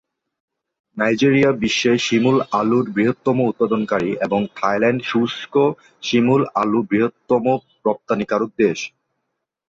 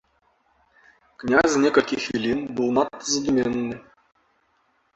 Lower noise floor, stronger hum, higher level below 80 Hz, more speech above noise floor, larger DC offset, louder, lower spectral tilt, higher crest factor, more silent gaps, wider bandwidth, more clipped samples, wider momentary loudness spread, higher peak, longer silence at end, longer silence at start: first, -77 dBFS vs -66 dBFS; neither; about the same, -58 dBFS vs -56 dBFS; first, 59 dB vs 45 dB; neither; first, -19 LUFS vs -22 LUFS; first, -5.5 dB/octave vs -4 dB/octave; second, 16 dB vs 22 dB; neither; about the same, 7.8 kHz vs 8.2 kHz; neither; second, 6 LU vs 11 LU; about the same, -4 dBFS vs -2 dBFS; second, 0.85 s vs 1.15 s; second, 0.95 s vs 1.2 s